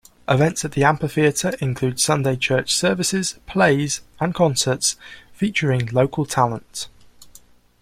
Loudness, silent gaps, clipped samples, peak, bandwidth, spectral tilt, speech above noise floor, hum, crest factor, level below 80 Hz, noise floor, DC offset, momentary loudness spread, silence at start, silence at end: -20 LUFS; none; under 0.1%; -2 dBFS; 15.5 kHz; -4 dB/octave; 30 dB; none; 20 dB; -50 dBFS; -50 dBFS; under 0.1%; 7 LU; 0.3 s; 0.55 s